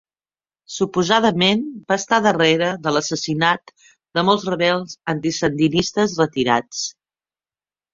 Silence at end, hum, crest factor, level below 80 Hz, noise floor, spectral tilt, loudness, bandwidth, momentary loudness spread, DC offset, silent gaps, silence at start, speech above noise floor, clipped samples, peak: 1.05 s; none; 18 dB; -56 dBFS; under -90 dBFS; -4 dB/octave; -19 LUFS; 7.8 kHz; 9 LU; under 0.1%; none; 0.7 s; over 71 dB; under 0.1%; -2 dBFS